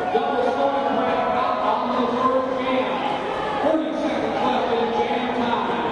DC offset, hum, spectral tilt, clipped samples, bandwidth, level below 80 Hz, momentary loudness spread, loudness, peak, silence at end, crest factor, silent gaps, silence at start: under 0.1%; none; -5.5 dB/octave; under 0.1%; 10.5 kHz; -54 dBFS; 3 LU; -22 LUFS; -8 dBFS; 0 s; 14 dB; none; 0 s